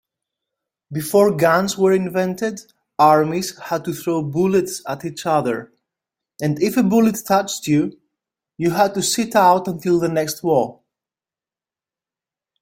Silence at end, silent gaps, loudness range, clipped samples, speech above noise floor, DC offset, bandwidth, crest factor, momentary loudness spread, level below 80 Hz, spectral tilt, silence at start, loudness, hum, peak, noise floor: 1.9 s; none; 3 LU; under 0.1%; over 72 dB; under 0.1%; 16.5 kHz; 18 dB; 12 LU; -60 dBFS; -5 dB/octave; 0.9 s; -19 LUFS; none; -2 dBFS; under -90 dBFS